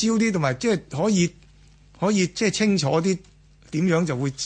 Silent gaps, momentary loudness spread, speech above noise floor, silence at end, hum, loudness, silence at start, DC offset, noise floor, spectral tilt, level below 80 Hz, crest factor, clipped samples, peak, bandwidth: none; 6 LU; 30 dB; 0 s; none; -23 LUFS; 0 s; under 0.1%; -52 dBFS; -5 dB/octave; -54 dBFS; 16 dB; under 0.1%; -8 dBFS; 9.8 kHz